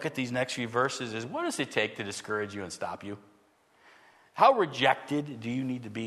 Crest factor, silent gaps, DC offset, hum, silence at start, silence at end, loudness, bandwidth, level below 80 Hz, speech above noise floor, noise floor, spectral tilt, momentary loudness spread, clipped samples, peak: 22 dB; none; under 0.1%; none; 0 s; 0 s; -29 LUFS; 13.5 kHz; -74 dBFS; 35 dB; -65 dBFS; -4.5 dB/octave; 14 LU; under 0.1%; -8 dBFS